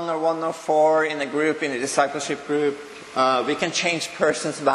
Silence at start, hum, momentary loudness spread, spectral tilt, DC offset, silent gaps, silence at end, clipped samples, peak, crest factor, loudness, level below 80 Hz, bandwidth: 0 s; none; 7 LU; -3 dB/octave; under 0.1%; none; 0 s; under 0.1%; -4 dBFS; 20 dB; -22 LUFS; -68 dBFS; 12.5 kHz